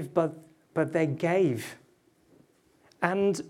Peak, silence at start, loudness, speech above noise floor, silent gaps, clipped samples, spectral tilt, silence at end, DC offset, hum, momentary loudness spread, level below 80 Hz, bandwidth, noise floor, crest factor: -8 dBFS; 0 s; -28 LUFS; 37 dB; none; under 0.1%; -6.5 dB/octave; 0 s; under 0.1%; none; 10 LU; -74 dBFS; 15.5 kHz; -64 dBFS; 22 dB